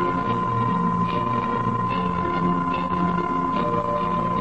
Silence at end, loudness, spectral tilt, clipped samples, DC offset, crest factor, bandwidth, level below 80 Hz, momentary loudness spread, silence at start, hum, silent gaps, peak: 0 s; -23 LUFS; -8.5 dB/octave; under 0.1%; 0.6%; 12 dB; 8 kHz; -46 dBFS; 1 LU; 0 s; none; none; -10 dBFS